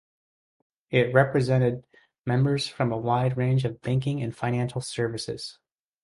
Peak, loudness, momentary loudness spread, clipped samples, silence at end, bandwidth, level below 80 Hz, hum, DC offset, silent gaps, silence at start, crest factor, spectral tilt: -6 dBFS; -26 LUFS; 11 LU; under 0.1%; 0.5 s; 11.5 kHz; -58 dBFS; none; under 0.1%; none; 0.9 s; 20 dB; -6.5 dB/octave